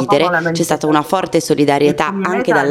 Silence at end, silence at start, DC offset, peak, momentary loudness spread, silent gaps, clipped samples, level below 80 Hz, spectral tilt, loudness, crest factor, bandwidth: 0 s; 0 s; under 0.1%; 0 dBFS; 4 LU; none; under 0.1%; -52 dBFS; -5 dB/octave; -15 LUFS; 14 dB; 16 kHz